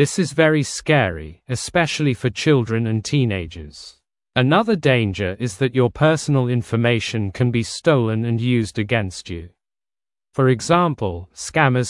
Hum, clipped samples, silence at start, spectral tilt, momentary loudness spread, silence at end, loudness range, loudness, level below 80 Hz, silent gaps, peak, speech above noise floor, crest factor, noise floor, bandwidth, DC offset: none; under 0.1%; 0 s; -5.5 dB/octave; 12 LU; 0 s; 3 LU; -19 LUFS; -50 dBFS; none; 0 dBFS; over 71 dB; 18 dB; under -90 dBFS; 12 kHz; under 0.1%